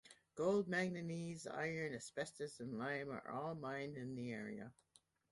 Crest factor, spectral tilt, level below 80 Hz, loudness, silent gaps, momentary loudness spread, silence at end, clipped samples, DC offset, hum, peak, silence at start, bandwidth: 18 dB; -5.5 dB/octave; -78 dBFS; -44 LUFS; none; 10 LU; 0.6 s; under 0.1%; under 0.1%; none; -26 dBFS; 0.05 s; 11.5 kHz